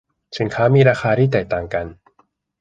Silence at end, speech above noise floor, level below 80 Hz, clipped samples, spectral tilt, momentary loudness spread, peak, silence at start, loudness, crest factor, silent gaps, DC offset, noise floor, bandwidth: 0.65 s; 44 dB; -46 dBFS; under 0.1%; -7.5 dB/octave; 14 LU; -2 dBFS; 0.3 s; -17 LUFS; 16 dB; none; under 0.1%; -61 dBFS; 7.8 kHz